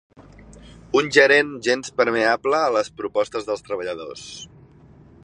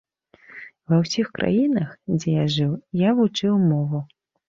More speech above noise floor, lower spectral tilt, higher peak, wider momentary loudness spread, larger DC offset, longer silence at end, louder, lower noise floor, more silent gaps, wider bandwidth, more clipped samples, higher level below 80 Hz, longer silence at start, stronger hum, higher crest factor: about the same, 28 dB vs 31 dB; second, -3.5 dB/octave vs -7 dB/octave; first, -2 dBFS vs -8 dBFS; first, 18 LU vs 14 LU; neither; first, 0.8 s vs 0.45 s; about the same, -20 LUFS vs -22 LUFS; about the same, -49 dBFS vs -52 dBFS; neither; first, 10.5 kHz vs 7.6 kHz; neither; about the same, -56 dBFS vs -58 dBFS; second, 0.2 s vs 0.55 s; neither; first, 20 dB vs 14 dB